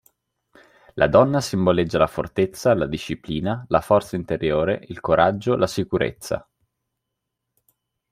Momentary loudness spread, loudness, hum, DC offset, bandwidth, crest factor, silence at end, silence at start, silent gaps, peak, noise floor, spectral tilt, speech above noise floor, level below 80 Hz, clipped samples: 10 LU; -21 LUFS; none; under 0.1%; 16 kHz; 20 dB; 1.7 s; 0.95 s; none; -2 dBFS; -81 dBFS; -6 dB/octave; 60 dB; -48 dBFS; under 0.1%